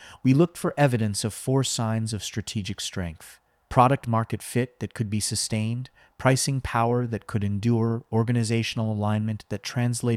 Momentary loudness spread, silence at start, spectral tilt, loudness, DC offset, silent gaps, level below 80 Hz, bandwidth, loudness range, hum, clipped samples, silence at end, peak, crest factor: 10 LU; 0 s; -5.5 dB/octave; -25 LUFS; under 0.1%; none; -52 dBFS; 15 kHz; 2 LU; none; under 0.1%; 0 s; -4 dBFS; 20 dB